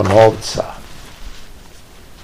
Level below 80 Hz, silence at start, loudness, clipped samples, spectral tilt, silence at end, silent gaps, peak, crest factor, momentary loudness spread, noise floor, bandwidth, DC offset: -38 dBFS; 0 s; -15 LUFS; 0.5%; -5.5 dB/octave; 0.6 s; none; 0 dBFS; 18 dB; 26 LU; -39 dBFS; 16 kHz; 0.6%